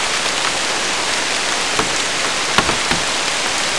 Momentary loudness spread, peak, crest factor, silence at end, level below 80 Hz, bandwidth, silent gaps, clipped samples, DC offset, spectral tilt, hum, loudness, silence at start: 2 LU; 0 dBFS; 18 dB; 0 s; -44 dBFS; 12 kHz; none; under 0.1%; 2%; -0.5 dB/octave; none; -16 LUFS; 0 s